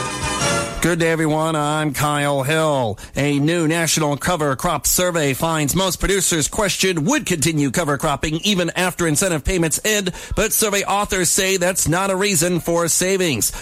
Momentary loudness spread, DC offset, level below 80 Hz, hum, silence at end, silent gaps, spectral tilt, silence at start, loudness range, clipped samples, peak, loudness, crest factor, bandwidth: 4 LU; under 0.1%; -36 dBFS; none; 0 s; none; -3.5 dB/octave; 0 s; 1 LU; under 0.1%; -4 dBFS; -18 LUFS; 14 dB; 16 kHz